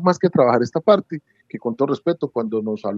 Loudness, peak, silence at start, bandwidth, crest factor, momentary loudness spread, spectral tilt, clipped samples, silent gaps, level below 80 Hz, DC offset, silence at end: -20 LUFS; 0 dBFS; 0 s; 7.8 kHz; 18 dB; 15 LU; -7.5 dB/octave; under 0.1%; none; -70 dBFS; under 0.1%; 0 s